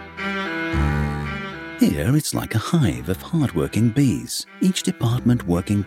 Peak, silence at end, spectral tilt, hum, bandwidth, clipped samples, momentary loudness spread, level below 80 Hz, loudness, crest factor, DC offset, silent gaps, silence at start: -4 dBFS; 0 s; -5.5 dB/octave; none; 16.5 kHz; under 0.1%; 8 LU; -36 dBFS; -22 LUFS; 16 dB; under 0.1%; none; 0 s